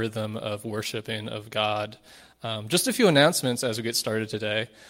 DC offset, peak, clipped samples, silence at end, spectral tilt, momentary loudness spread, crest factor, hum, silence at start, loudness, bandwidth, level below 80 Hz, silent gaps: under 0.1%; -6 dBFS; under 0.1%; 0 s; -3.5 dB/octave; 13 LU; 20 dB; none; 0 s; -26 LUFS; 16.5 kHz; -66 dBFS; none